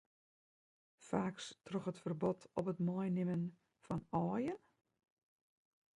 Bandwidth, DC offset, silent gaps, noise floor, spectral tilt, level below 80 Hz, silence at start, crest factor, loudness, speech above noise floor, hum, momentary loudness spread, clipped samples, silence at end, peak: 11 kHz; under 0.1%; none; under -90 dBFS; -7.5 dB/octave; -74 dBFS; 1 s; 20 dB; -41 LUFS; over 50 dB; none; 7 LU; under 0.1%; 1.4 s; -24 dBFS